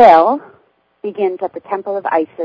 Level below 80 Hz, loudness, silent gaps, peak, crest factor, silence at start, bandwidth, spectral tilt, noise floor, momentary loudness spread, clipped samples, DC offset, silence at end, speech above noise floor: -58 dBFS; -16 LUFS; none; 0 dBFS; 14 dB; 0 s; 6.8 kHz; -6.5 dB/octave; -55 dBFS; 15 LU; 0.6%; under 0.1%; 0 s; 42 dB